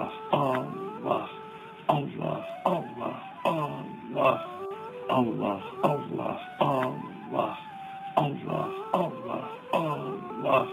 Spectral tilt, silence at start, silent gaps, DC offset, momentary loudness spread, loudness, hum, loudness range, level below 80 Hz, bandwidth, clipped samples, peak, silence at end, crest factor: -7.5 dB/octave; 0 s; none; under 0.1%; 11 LU; -30 LUFS; none; 2 LU; -70 dBFS; 16 kHz; under 0.1%; -8 dBFS; 0 s; 22 dB